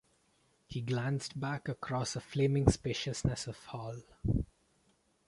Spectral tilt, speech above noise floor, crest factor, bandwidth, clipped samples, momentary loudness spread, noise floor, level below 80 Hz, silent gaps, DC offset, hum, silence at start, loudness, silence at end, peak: -5.5 dB/octave; 38 dB; 26 dB; 11.5 kHz; under 0.1%; 14 LU; -72 dBFS; -48 dBFS; none; under 0.1%; none; 0.7 s; -35 LUFS; 0.85 s; -10 dBFS